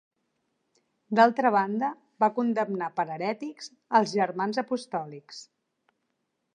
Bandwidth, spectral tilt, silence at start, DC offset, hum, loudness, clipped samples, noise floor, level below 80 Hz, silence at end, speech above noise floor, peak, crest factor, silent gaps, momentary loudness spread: 10 kHz; -5.5 dB/octave; 1.1 s; under 0.1%; none; -27 LUFS; under 0.1%; -79 dBFS; -86 dBFS; 1.1 s; 52 dB; -6 dBFS; 22 dB; none; 18 LU